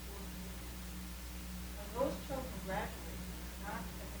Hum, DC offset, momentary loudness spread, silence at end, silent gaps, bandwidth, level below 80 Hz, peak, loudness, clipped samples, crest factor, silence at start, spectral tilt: 60 Hz at -50 dBFS; under 0.1%; 8 LU; 0 s; none; over 20 kHz; -48 dBFS; -24 dBFS; -43 LUFS; under 0.1%; 20 dB; 0 s; -4.5 dB/octave